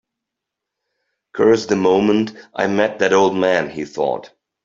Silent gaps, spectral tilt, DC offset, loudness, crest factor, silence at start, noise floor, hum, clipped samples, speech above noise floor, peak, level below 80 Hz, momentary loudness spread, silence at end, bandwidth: none; -5.5 dB/octave; under 0.1%; -17 LUFS; 16 dB; 1.35 s; -82 dBFS; none; under 0.1%; 66 dB; -2 dBFS; -58 dBFS; 10 LU; 0.4 s; 7.6 kHz